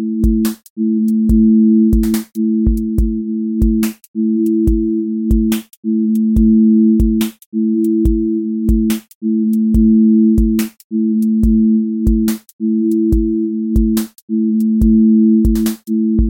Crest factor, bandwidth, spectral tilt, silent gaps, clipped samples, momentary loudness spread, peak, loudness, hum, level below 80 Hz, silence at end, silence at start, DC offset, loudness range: 12 dB; 17 kHz; -8 dB/octave; 0.70-0.76 s, 4.08-4.14 s, 5.77-5.83 s, 7.46-7.52 s, 9.15-9.21 s, 10.84-10.90 s, 12.53-12.59 s, 14.22-14.28 s; under 0.1%; 9 LU; -2 dBFS; -14 LUFS; none; -22 dBFS; 0 s; 0 s; under 0.1%; 2 LU